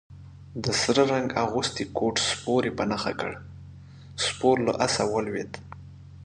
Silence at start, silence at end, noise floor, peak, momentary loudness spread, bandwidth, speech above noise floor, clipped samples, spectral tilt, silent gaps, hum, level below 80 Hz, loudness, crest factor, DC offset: 0.1 s; 0 s; -45 dBFS; -6 dBFS; 22 LU; 11 kHz; 20 dB; under 0.1%; -4 dB/octave; none; none; -52 dBFS; -26 LUFS; 20 dB; under 0.1%